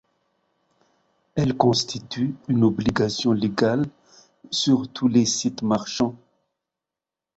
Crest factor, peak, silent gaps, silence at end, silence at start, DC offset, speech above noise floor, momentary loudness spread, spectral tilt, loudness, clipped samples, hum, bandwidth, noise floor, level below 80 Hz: 22 dB; -2 dBFS; none; 1.2 s; 1.35 s; under 0.1%; 66 dB; 8 LU; -5 dB/octave; -22 LUFS; under 0.1%; none; 8.2 kHz; -88 dBFS; -54 dBFS